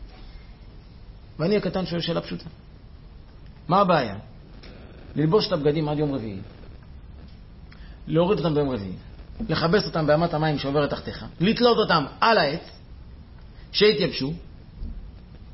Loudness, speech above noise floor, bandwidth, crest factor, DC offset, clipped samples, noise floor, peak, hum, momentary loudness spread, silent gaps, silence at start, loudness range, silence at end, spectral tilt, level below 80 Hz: -23 LUFS; 22 dB; 6 kHz; 18 dB; under 0.1%; under 0.1%; -44 dBFS; -6 dBFS; none; 25 LU; none; 0 s; 6 LU; 0 s; -9 dB/octave; -44 dBFS